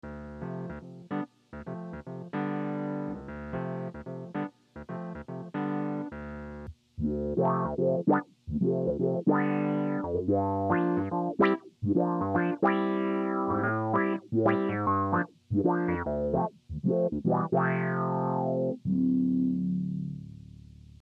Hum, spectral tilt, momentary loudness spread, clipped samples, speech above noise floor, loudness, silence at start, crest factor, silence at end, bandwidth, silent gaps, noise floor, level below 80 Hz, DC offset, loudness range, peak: none; -10 dB/octave; 14 LU; under 0.1%; 23 dB; -29 LUFS; 0.05 s; 18 dB; 0.4 s; 5.2 kHz; none; -50 dBFS; -54 dBFS; under 0.1%; 9 LU; -12 dBFS